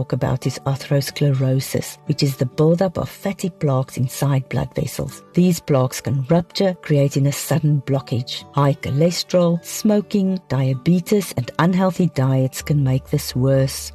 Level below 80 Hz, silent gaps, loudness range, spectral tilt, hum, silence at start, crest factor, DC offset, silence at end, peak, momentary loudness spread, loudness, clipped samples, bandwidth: -46 dBFS; none; 2 LU; -6.5 dB/octave; none; 0 s; 12 dB; under 0.1%; 0 s; -6 dBFS; 7 LU; -20 LUFS; under 0.1%; 13.5 kHz